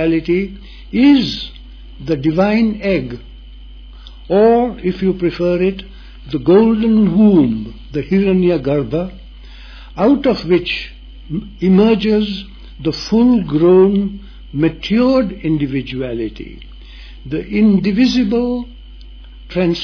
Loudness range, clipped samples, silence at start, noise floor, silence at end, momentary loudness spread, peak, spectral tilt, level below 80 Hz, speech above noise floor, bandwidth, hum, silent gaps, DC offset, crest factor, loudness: 4 LU; under 0.1%; 0 s; -35 dBFS; 0 s; 16 LU; 0 dBFS; -8 dB/octave; -36 dBFS; 21 dB; 5.4 kHz; none; none; under 0.1%; 14 dB; -15 LUFS